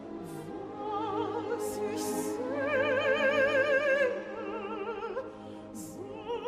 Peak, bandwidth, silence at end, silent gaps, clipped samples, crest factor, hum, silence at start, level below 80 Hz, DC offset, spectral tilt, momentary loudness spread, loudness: -16 dBFS; 15.5 kHz; 0 s; none; under 0.1%; 16 dB; none; 0 s; -66 dBFS; under 0.1%; -4 dB/octave; 16 LU; -31 LUFS